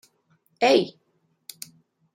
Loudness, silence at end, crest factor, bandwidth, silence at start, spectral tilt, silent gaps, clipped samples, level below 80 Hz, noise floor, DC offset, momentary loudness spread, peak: -22 LUFS; 1.25 s; 22 dB; 16.5 kHz; 0.6 s; -4 dB/octave; none; under 0.1%; -78 dBFS; -66 dBFS; under 0.1%; 25 LU; -6 dBFS